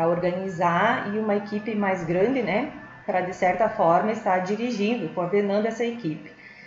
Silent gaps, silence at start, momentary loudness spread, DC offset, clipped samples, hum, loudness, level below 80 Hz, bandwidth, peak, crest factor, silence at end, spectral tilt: none; 0 s; 8 LU; under 0.1%; under 0.1%; none; -24 LUFS; -60 dBFS; 7.8 kHz; -8 dBFS; 16 dB; 0 s; -6.5 dB/octave